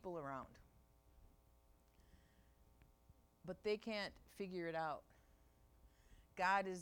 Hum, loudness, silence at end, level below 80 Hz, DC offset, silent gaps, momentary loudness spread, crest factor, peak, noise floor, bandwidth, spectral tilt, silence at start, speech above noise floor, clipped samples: none; -45 LUFS; 0 s; -72 dBFS; under 0.1%; none; 17 LU; 22 dB; -26 dBFS; -72 dBFS; 19 kHz; -5 dB/octave; 0.05 s; 28 dB; under 0.1%